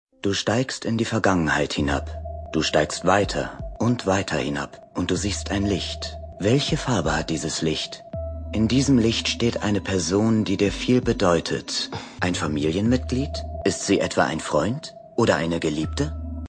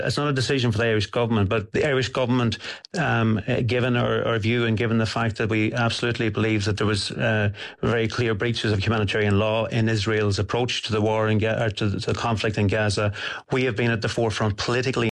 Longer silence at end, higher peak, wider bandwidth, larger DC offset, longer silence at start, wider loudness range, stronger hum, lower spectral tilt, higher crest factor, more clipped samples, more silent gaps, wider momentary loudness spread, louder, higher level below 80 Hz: about the same, 0 s vs 0 s; first, -4 dBFS vs -12 dBFS; about the same, 10 kHz vs 11 kHz; neither; first, 0.25 s vs 0 s; about the same, 3 LU vs 1 LU; neither; about the same, -5 dB/octave vs -6 dB/octave; first, 20 dB vs 10 dB; neither; neither; first, 9 LU vs 3 LU; about the same, -23 LUFS vs -23 LUFS; first, -38 dBFS vs -50 dBFS